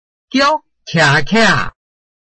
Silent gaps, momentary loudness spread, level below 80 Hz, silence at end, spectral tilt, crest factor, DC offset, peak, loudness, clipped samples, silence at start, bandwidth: none; 9 LU; -38 dBFS; 0.5 s; -4.5 dB/octave; 14 dB; under 0.1%; 0 dBFS; -13 LUFS; under 0.1%; 0.35 s; 8.8 kHz